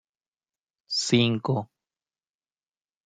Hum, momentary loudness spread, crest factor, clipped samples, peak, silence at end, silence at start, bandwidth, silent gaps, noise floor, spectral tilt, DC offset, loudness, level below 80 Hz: none; 9 LU; 22 dB; under 0.1%; -8 dBFS; 1.4 s; 0.9 s; 9.6 kHz; none; under -90 dBFS; -4.5 dB/octave; under 0.1%; -25 LUFS; -66 dBFS